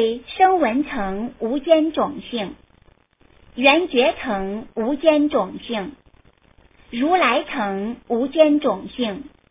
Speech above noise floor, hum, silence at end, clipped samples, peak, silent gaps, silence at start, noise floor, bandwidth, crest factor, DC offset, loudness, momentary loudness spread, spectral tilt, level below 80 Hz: 36 dB; none; 0.25 s; under 0.1%; 0 dBFS; none; 0 s; -55 dBFS; 3.9 kHz; 20 dB; under 0.1%; -20 LUFS; 12 LU; -9 dB/octave; -52 dBFS